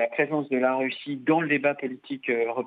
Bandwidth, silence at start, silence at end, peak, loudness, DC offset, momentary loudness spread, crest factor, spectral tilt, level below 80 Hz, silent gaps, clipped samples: 4.7 kHz; 0 s; 0 s; -8 dBFS; -26 LUFS; under 0.1%; 9 LU; 16 dB; -8.5 dB/octave; -84 dBFS; none; under 0.1%